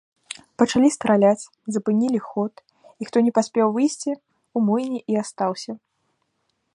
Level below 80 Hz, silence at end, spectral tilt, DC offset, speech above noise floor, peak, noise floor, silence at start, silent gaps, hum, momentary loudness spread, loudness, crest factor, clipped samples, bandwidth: -66 dBFS; 1 s; -5.5 dB/octave; under 0.1%; 52 dB; -2 dBFS; -73 dBFS; 0.3 s; none; none; 17 LU; -22 LUFS; 20 dB; under 0.1%; 11.5 kHz